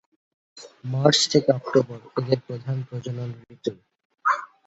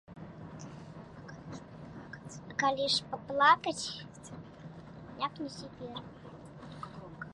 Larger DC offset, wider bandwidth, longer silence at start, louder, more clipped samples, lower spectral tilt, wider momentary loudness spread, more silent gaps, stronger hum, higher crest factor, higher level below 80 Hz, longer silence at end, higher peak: neither; second, 8.2 kHz vs 11.5 kHz; first, 0.55 s vs 0.1 s; first, -24 LUFS vs -31 LUFS; neither; about the same, -4.5 dB/octave vs -3.5 dB/octave; second, 14 LU vs 22 LU; first, 4.05-4.10 s vs none; neither; about the same, 22 dB vs 24 dB; about the same, -64 dBFS vs -64 dBFS; first, 0.2 s vs 0 s; first, -2 dBFS vs -12 dBFS